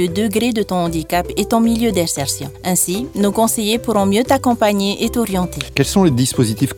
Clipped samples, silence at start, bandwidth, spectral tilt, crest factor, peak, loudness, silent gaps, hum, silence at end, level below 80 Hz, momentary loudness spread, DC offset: under 0.1%; 0 s; 19.5 kHz; -4.5 dB/octave; 16 dB; 0 dBFS; -16 LUFS; none; none; 0 s; -38 dBFS; 5 LU; under 0.1%